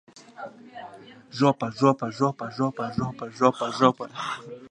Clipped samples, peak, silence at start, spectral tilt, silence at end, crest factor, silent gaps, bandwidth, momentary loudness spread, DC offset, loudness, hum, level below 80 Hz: under 0.1%; -2 dBFS; 0.15 s; -6.5 dB/octave; 0.05 s; 24 dB; none; 10 kHz; 19 LU; under 0.1%; -25 LUFS; none; -62 dBFS